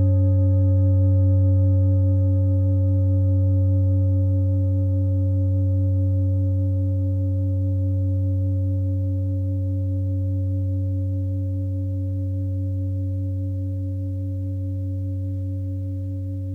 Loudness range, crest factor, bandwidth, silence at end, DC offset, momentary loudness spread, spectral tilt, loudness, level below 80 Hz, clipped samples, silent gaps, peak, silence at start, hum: 7 LU; 10 dB; 1.3 kHz; 0 s; under 0.1%; 9 LU; -13 dB/octave; -22 LUFS; -48 dBFS; under 0.1%; none; -12 dBFS; 0 s; 50 Hz at -55 dBFS